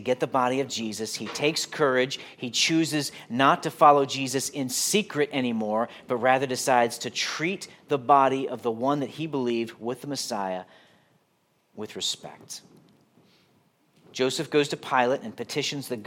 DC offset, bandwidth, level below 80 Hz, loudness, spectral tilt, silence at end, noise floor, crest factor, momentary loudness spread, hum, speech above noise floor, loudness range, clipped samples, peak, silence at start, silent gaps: under 0.1%; 17.5 kHz; -78 dBFS; -25 LUFS; -3.5 dB/octave; 0 s; -69 dBFS; 22 dB; 11 LU; none; 43 dB; 11 LU; under 0.1%; -4 dBFS; 0 s; none